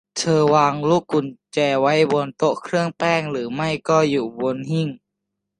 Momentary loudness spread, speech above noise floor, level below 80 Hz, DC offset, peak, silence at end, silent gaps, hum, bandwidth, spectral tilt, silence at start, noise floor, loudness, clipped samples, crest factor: 8 LU; 60 dB; -62 dBFS; under 0.1%; -2 dBFS; 0.65 s; none; none; 11 kHz; -5.5 dB/octave; 0.15 s; -80 dBFS; -20 LUFS; under 0.1%; 18 dB